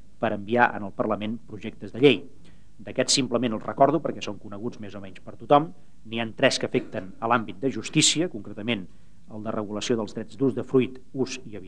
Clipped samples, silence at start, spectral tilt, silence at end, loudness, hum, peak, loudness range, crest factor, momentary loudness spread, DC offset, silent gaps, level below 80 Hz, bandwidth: under 0.1%; 0.2 s; -4 dB/octave; 0 s; -25 LUFS; none; -4 dBFS; 2 LU; 22 dB; 16 LU; 1%; none; -60 dBFS; 10.5 kHz